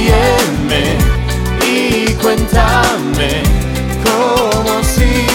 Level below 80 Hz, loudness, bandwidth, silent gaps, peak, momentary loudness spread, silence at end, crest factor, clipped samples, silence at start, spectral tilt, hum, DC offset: -18 dBFS; -12 LUFS; 17.5 kHz; none; 0 dBFS; 4 LU; 0 s; 12 dB; under 0.1%; 0 s; -4.5 dB/octave; none; under 0.1%